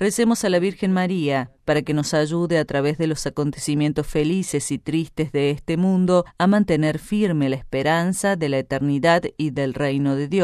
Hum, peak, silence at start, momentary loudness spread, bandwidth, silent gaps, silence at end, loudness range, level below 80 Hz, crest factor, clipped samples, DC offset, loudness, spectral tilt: none; -4 dBFS; 0 s; 6 LU; 13.5 kHz; none; 0 s; 2 LU; -46 dBFS; 16 dB; under 0.1%; under 0.1%; -21 LUFS; -6 dB/octave